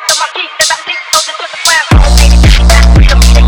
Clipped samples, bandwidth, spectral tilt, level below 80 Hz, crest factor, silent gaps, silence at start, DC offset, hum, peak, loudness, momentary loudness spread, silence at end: 0.9%; 19.5 kHz; -3.5 dB/octave; -8 dBFS; 6 dB; none; 0 s; under 0.1%; none; 0 dBFS; -7 LUFS; 6 LU; 0 s